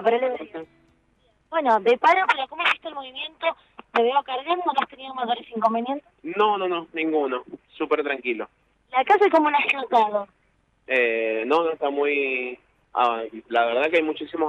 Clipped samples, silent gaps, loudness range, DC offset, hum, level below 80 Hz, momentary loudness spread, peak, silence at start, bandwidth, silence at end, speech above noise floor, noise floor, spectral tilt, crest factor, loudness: under 0.1%; none; 4 LU; under 0.1%; none; -70 dBFS; 14 LU; -6 dBFS; 0 s; 9.2 kHz; 0 s; 43 dB; -65 dBFS; -4.5 dB/octave; 18 dB; -23 LUFS